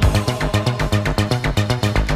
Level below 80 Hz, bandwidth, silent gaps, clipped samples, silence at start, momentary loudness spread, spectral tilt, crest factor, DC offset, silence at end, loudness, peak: -24 dBFS; 15.5 kHz; none; under 0.1%; 0 s; 1 LU; -5.5 dB/octave; 14 dB; under 0.1%; 0 s; -19 LUFS; -4 dBFS